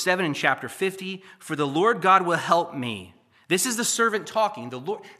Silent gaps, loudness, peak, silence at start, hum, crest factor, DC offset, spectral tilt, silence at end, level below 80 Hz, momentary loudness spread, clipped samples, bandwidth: none; -23 LUFS; -4 dBFS; 0 s; none; 20 dB; under 0.1%; -3 dB/octave; 0.05 s; -76 dBFS; 15 LU; under 0.1%; 15 kHz